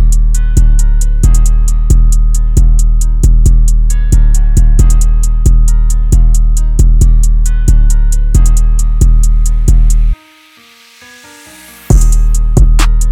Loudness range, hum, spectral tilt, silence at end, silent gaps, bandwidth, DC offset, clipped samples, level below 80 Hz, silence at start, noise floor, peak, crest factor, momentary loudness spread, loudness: 4 LU; none; -5.5 dB/octave; 0 s; none; 12 kHz; under 0.1%; 0.5%; -6 dBFS; 0 s; -41 dBFS; 0 dBFS; 6 dB; 3 LU; -11 LUFS